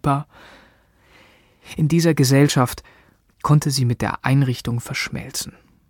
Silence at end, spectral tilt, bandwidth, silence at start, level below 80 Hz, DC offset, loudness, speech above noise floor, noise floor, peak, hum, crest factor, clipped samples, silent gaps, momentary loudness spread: 0.4 s; -5.5 dB/octave; 17.5 kHz; 0.05 s; -48 dBFS; under 0.1%; -20 LUFS; 36 dB; -55 dBFS; -2 dBFS; none; 20 dB; under 0.1%; none; 13 LU